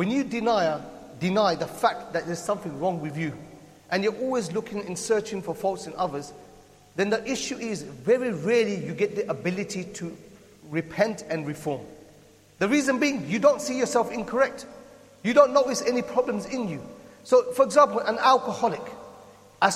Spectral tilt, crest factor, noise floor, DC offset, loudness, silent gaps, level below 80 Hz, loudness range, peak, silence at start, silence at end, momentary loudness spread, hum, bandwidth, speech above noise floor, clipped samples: -4.5 dB/octave; 22 dB; -54 dBFS; under 0.1%; -25 LUFS; none; -62 dBFS; 6 LU; -4 dBFS; 0 s; 0 s; 14 LU; none; 14.5 kHz; 29 dB; under 0.1%